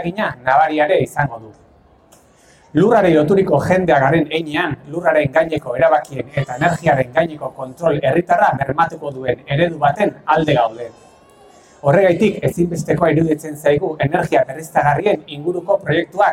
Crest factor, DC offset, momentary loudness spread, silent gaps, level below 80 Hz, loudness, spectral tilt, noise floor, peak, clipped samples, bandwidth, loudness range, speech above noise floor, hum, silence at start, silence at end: 16 dB; under 0.1%; 9 LU; none; -48 dBFS; -16 LUFS; -6.5 dB/octave; -49 dBFS; 0 dBFS; under 0.1%; 16 kHz; 2 LU; 34 dB; none; 0 s; 0 s